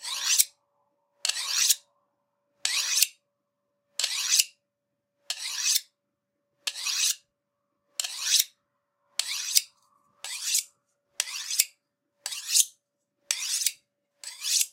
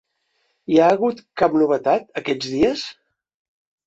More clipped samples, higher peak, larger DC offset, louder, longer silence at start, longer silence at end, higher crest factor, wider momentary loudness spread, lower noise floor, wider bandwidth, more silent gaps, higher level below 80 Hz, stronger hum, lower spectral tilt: neither; about the same, 0 dBFS vs -2 dBFS; neither; second, -26 LUFS vs -19 LUFS; second, 0 s vs 0.7 s; second, 0.05 s vs 0.95 s; first, 30 dB vs 18 dB; about the same, 13 LU vs 11 LU; first, -82 dBFS vs -69 dBFS; first, 16.5 kHz vs 8 kHz; neither; second, under -90 dBFS vs -54 dBFS; neither; second, 7 dB/octave vs -5.5 dB/octave